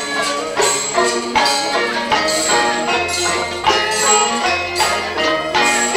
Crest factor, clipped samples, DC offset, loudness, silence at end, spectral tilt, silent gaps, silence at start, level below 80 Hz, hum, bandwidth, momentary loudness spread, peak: 16 dB; under 0.1%; under 0.1%; -15 LUFS; 0 s; -1 dB/octave; none; 0 s; -48 dBFS; none; 16.5 kHz; 4 LU; 0 dBFS